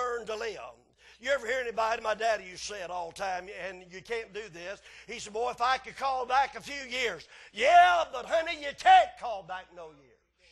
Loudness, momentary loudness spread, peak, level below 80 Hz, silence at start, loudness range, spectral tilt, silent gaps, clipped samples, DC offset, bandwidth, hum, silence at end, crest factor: -28 LUFS; 21 LU; -8 dBFS; -62 dBFS; 0 s; 9 LU; -1.5 dB/octave; none; under 0.1%; under 0.1%; 12 kHz; none; 0.6 s; 20 dB